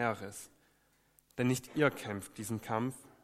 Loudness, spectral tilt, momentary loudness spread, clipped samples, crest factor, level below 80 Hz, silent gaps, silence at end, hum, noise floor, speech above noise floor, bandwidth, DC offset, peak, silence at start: -36 LUFS; -5.5 dB/octave; 16 LU; under 0.1%; 22 dB; -72 dBFS; none; 0.15 s; none; -71 dBFS; 36 dB; 16 kHz; under 0.1%; -14 dBFS; 0 s